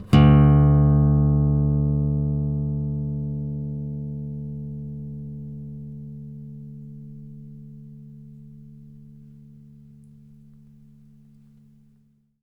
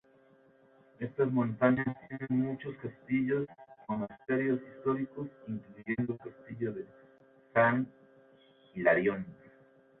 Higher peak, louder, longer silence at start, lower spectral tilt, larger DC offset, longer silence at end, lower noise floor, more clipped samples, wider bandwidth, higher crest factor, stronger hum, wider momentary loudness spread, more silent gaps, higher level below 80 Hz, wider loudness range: first, -4 dBFS vs -12 dBFS; first, -21 LUFS vs -33 LUFS; second, 0 s vs 1 s; about the same, -10 dB/octave vs -11 dB/octave; neither; first, 3.4 s vs 0.65 s; about the same, -61 dBFS vs -63 dBFS; neither; first, 5 kHz vs 4 kHz; about the same, 18 dB vs 22 dB; neither; first, 27 LU vs 15 LU; neither; first, -34 dBFS vs -70 dBFS; first, 25 LU vs 3 LU